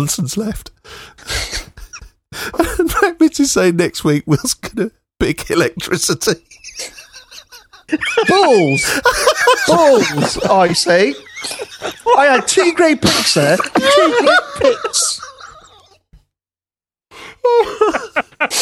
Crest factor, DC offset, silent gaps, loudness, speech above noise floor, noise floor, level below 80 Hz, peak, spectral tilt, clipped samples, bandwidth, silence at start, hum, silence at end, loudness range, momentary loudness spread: 16 dB; under 0.1%; none; -14 LUFS; over 76 dB; under -90 dBFS; -40 dBFS; 0 dBFS; -3.5 dB/octave; under 0.1%; 17.5 kHz; 0 s; none; 0 s; 8 LU; 14 LU